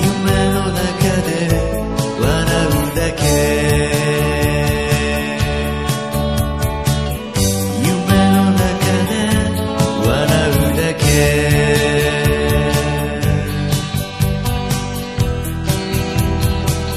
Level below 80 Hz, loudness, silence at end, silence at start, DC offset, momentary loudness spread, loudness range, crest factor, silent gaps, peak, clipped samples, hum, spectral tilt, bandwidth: -24 dBFS; -16 LUFS; 0 s; 0 s; 0.3%; 6 LU; 4 LU; 16 dB; none; 0 dBFS; under 0.1%; none; -5 dB/octave; 15 kHz